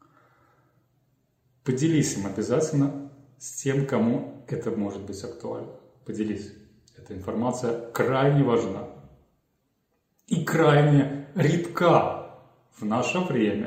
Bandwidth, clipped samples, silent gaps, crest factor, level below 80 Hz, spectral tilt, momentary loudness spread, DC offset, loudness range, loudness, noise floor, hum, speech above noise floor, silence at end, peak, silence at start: 16 kHz; under 0.1%; none; 22 dB; -62 dBFS; -6.5 dB/octave; 17 LU; under 0.1%; 8 LU; -25 LUFS; -73 dBFS; none; 49 dB; 0 s; -4 dBFS; 1.65 s